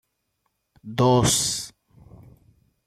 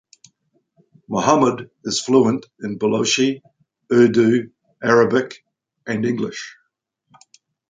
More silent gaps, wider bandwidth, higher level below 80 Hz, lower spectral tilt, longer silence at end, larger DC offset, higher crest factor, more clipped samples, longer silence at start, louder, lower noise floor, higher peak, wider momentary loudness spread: neither; first, 15.5 kHz vs 9.4 kHz; first, -48 dBFS vs -62 dBFS; about the same, -4 dB/octave vs -4.5 dB/octave; about the same, 1.2 s vs 1.2 s; neither; about the same, 18 dB vs 20 dB; neither; second, 0.85 s vs 1.1 s; second, -21 LUFS vs -18 LUFS; first, -75 dBFS vs -71 dBFS; second, -8 dBFS vs 0 dBFS; about the same, 15 LU vs 17 LU